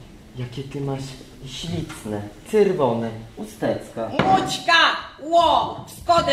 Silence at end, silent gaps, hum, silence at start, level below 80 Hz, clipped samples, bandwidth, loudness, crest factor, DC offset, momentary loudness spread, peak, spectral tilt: 0 s; none; none; 0 s; -48 dBFS; under 0.1%; 15.5 kHz; -21 LUFS; 18 dB; under 0.1%; 18 LU; -4 dBFS; -4.5 dB/octave